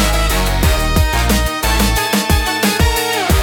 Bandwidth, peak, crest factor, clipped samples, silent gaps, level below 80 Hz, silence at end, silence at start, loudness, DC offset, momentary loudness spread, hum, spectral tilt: 17.5 kHz; 0 dBFS; 12 dB; under 0.1%; none; -18 dBFS; 0 s; 0 s; -14 LUFS; under 0.1%; 1 LU; none; -4 dB/octave